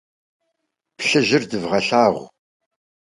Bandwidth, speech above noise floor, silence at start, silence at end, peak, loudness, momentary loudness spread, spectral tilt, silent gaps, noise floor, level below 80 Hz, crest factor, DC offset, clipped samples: 11.5 kHz; 58 dB; 1 s; 0.8 s; -2 dBFS; -18 LUFS; 7 LU; -4 dB/octave; none; -77 dBFS; -60 dBFS; 20 dB; under 0.1%; under 0.1%